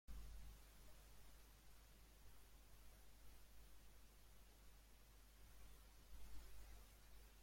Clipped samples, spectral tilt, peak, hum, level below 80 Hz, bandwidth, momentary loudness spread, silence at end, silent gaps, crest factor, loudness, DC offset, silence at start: under 0.1%; -3.5 dB/octave; -44 dBFS; none; -64 dBFS; 16.5 kHz; 6 LU; 0 s; none; 18 dB; -67 LUFS; under 0.1%; 0.1 s